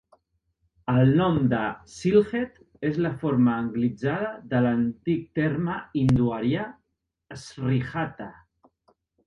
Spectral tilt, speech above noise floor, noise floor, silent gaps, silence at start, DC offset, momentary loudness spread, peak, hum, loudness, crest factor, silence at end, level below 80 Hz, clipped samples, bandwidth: -8 dB/octave; 49 dB; -73 dBFS; none; 0.85 s; under 0.1%; 13 LU; -8 dBFS; none; -25 LUFS; 18 dB; 0.95 s; -52 dBFS; under 0.1%; 10 kHz